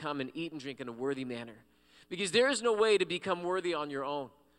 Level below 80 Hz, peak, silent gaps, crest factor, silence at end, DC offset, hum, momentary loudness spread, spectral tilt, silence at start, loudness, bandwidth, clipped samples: -74 dBFS; -14 dBFS; none; 18 dB; 0.3 s; under 0.1%; none; 14 LU; -3.5 dB/octave; 0 s; -32 LUFS; 12 kHz; under 0.1%